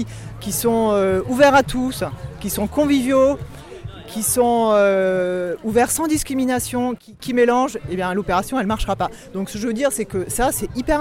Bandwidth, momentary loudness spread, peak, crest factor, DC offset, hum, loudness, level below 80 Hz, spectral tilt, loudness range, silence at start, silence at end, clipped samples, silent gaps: 17 kHz; 13 LU; -4 dBFS; 14 dB; under 0.1%; none; -19 LUFS; -38 dBFS; -4.5 dB/octave; 3 LU; 0 s; 0 s; under 0.1%; none